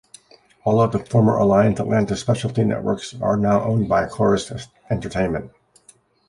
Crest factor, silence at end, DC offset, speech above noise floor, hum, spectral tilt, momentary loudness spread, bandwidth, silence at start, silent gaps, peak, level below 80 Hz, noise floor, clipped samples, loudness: 16 dB; 0.8 s; under 0.1%; 35 dB; none; -7 dB/octave; 11 LU; 11.5 kHz; 0.65 s; none; -4 dBFS; -46 dBFS; -54 dBFS; under 0.1%; -20 LUFS